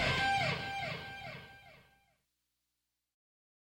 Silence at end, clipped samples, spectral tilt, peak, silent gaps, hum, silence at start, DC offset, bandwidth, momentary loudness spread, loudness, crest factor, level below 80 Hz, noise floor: 2 s; under 0.1%; -4 dB/octave; -18 dBFS; none; 60 Hz at -75 dBFS; 0 s; under 0.1%; 16.5 kHz; 22 LU; -35 LUFS; 22 dB; -60 dBFS; -87 dBFS